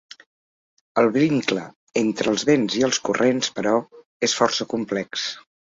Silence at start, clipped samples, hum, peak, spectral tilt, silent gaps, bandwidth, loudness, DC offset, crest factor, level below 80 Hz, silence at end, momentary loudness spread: 0.95 s; under 0.1%; none; -4 dBFS; -4 dB/octave; 1.76-1.87 s, 4.05-4.20 s; 8 kHz; -22 LUFS; under 0.1%; 20 dB; -64 dBFS; 0.4 s; 8 LU